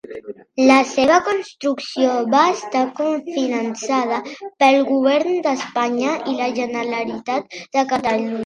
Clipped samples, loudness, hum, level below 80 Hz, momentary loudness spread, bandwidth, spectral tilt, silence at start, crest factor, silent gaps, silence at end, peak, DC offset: under 0.1%; -19 LUFS; none; -62 dBFS; 10 LU; 10.5 kHz; -3.5 dB/octave; 0.05 s; 18 dB; none; 0 s; 0 dBFS; under 0.1%